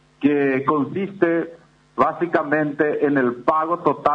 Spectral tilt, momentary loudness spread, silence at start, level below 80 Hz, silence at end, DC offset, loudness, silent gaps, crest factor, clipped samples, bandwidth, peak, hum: -8.5 dB/octave; 4 LU; 0.2 s; -62 dBFS; 0 s; under 0.1%; -20 LUFS; none; 16 dB; under 0.1%; 5.8 kHz; -4 dBFS; none